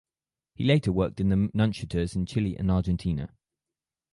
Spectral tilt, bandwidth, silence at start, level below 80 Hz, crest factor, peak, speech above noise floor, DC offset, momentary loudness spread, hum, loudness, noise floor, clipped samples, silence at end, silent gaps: -7.5 dB/octave; 11.5 kHz; 0.6 s; -42 dBFS; 18 dB; -8 dBFS; over 64 dB; under 0.1%; 7 LU; none; -27 LUFS; under -90 dBFS; under 0.1%; 0.85 s; none